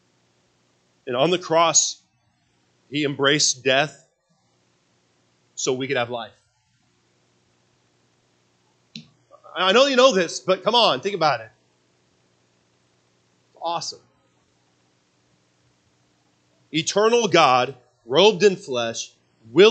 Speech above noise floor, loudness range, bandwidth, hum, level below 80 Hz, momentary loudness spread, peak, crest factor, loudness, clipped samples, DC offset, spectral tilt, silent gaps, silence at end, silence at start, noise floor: 46 dB; 16 LU; 9.2 kHz; 60 Hz at -65 dBFS; -76 dBFS; 18 LU; 0 dBFS; 22 dB; -20 LUFS; under 0.1%; under 0.1%; -2.5 dB/octave; none; 0 s; 1.05 s; -66 dBFS